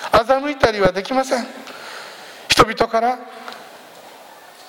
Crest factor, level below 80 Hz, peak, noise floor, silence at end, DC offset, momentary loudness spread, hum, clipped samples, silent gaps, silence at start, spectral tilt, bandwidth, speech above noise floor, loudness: 20 dB; -44 dBFS; 0 dBFS; -42 dBFS; 0.05 s; under 0.1%; 21 LU; none; under 0.1%; none; 0 s; -3.5 dB/octave; 17.5 kHz; 24 dB; -17 LUFS